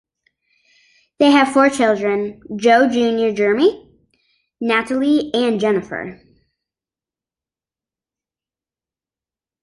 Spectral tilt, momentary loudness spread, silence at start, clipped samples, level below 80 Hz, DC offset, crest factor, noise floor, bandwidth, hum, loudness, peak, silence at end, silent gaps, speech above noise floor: -4.5 dB/octave; 11 LU; 1.2 s; under 0.1%; -60 dBFS; under 0.1%; 18 dB; under -90 dBFS; 11.5 kHz; none; -16 LUFS; -2 dBFS; 3.5 s; none; over 74 dB